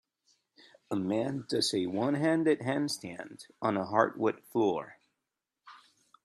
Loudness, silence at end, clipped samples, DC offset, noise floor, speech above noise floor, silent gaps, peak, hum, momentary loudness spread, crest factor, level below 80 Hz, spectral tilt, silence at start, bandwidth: -31 LUFS; 0.5 s; under 0.1%; under 0.1%; -87 dBFS; 57 dB; none; -10 dBFS; none; 10 LU; 22 dB; -76 dBFS; -5 dB/octave; 0.9 s; 13.5 kHz